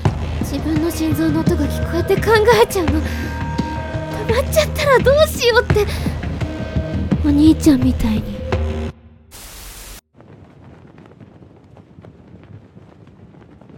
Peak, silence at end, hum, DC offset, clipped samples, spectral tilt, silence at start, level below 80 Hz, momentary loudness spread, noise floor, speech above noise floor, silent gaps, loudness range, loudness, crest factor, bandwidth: 0 dBFS; 0 s; none; under 0.1%; under 0.1%; -6 dB/octave; 0 s; -28 dBFS; 13 LU; -44 dBFS; 29 dB; none; 10 LU; -17 LUFS; 18 dB; 17.5 kHz